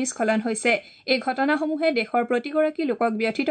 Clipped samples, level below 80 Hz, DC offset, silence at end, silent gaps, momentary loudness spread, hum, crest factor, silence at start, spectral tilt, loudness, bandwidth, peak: under 0.1%; -76 dBFS; under 0.1%; 0 s; none; 2 LU; none; 16 dB; 0 s; -3.5 dB/octave; -23 LUFS; 9.4 kHz; -8 dBFS